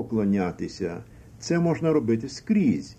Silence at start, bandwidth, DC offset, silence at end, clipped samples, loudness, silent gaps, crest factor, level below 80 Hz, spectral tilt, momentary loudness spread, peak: 0 s; 9.2 kHz; under 0.1%; 0.05 s; under 0.1%; -25 LUFS; none; 14 dB; -52 dBFS; -7 dB/octave; 10 LU; -12 dBFS